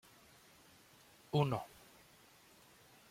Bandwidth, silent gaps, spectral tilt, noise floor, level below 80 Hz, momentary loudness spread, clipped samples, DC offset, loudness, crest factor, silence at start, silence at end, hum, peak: 16.5 kHz; none; -7 dB/octave; -64 dBFS; -74 dBFS; 27 LU; under 0.1%; under 0.1%; -38 LUFS; 24 dB; 1.35 s; 1.45 s; none; -18 dBFS